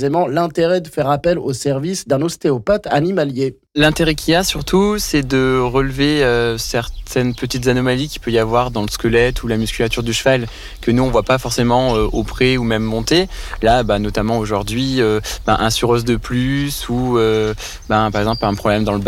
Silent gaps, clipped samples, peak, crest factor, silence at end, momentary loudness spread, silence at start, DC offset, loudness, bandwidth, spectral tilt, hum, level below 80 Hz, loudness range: none; under 0.1%; -4 dBFS; 12 dB; 0 s; 5 LU; 0 s; under 0.1%; -17 LUFS; 16.5 kHz; -5 dB/octave; none; -30 dBFS; 2 LU